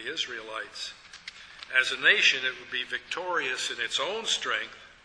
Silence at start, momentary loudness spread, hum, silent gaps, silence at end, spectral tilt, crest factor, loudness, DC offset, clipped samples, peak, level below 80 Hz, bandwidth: 0 s; 20 LU; none; none; 0.15 s; 0.5 dB/octave; 22 dB; -27 LUFS; under 0.1%; under 0.1%; -8 dBFS; -68 dBFS; 11 kHz